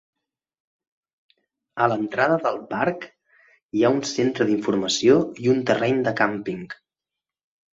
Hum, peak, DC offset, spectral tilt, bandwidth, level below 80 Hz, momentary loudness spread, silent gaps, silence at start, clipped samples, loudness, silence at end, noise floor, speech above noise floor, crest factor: none; -4 dBFS; under 0.1%; -5 dB/octave; 7.8 kHz; -64 dBFS; 15 LU; 3.62-3.69 s; 1.75 s; under 0.1%; -22 LUFS; 1 s; -88 dBFS; 66 dB; 20 dB